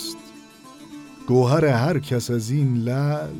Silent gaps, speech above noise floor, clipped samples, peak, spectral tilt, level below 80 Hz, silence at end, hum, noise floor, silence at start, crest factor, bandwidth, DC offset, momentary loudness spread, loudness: none; 24 dB; under 0.1%; -6 dBFS; -6.5 dB/octave; -56 dBFS; 0 s; none; -44 dBFS; 0 s; 16 dB; 16.5 kHz; under 0.1%; 22 LU; -21 LUFS